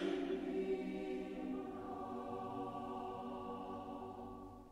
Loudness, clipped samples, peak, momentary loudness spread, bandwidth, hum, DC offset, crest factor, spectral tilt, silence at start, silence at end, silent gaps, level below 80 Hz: -45 LUFS; under 0.1%; -30 dBFS; 8 LU; 12 kHz; none; under 0.1%; 14 dB; -7 dB/octave; 0 s; 0 s; none; -66 dBFS